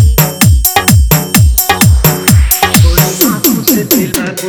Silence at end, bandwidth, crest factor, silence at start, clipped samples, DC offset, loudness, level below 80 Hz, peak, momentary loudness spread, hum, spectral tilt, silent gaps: 0 s; over 20 kHz; 8 dB; 0 s; 1%; under 0.1%; -8 LUFS; -14 dBFS; 0 dBFS; 3 LU; none; -4.5 dB/octave; none